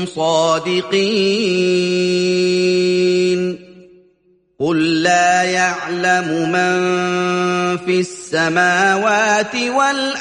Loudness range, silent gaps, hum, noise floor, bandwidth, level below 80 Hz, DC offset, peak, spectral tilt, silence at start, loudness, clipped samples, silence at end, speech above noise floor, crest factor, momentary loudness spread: 2 LU; none; none; -57 dBFS; 10.5 kHz; -60 dBFS; under 0.1%; -2 dBFS; -4 dB/octave; 0 s; -16 LUFS; under 0.1%; 0 s; 42 dB; 14 dB; 5 LU